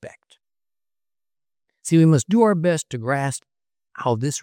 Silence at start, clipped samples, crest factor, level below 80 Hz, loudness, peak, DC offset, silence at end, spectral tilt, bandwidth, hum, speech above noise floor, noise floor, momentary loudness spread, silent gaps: 0.05 s; under 0.1%; 16 dB; -68 dBFS; -20 LUFS; -6 dBFS; under 0.1%; 0 s; -6 dB/octave; 15 kHz; none; over 71 dB; under -90 dBFS; 12 LU; none